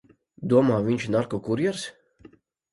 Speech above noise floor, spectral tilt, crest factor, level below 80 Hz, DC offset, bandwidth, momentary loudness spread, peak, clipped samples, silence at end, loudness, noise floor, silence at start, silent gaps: 31 dB; -6.5 dB/octave; 18 dB; -60 dBFS; under 0.1%; 11.5 kHz; 15 LU; -8 dBFS; under 0.1%; 0.8 s; -24 LUFS; -54 dBFS; 0.4 s; none